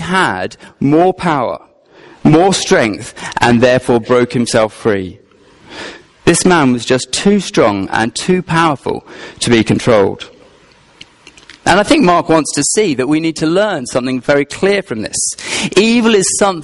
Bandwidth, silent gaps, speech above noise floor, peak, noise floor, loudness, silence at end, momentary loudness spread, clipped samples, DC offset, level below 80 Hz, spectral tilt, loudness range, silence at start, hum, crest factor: 11.5 kHz; none; 33 dB; 0 dBFS; -46 dBFS; -12 LUFS; 0 s; 12 LU; under 0.1%; under 0.1%; -42 dBFS; -4.5 dB/octave; 2 LU; 0 s; none; 14 dB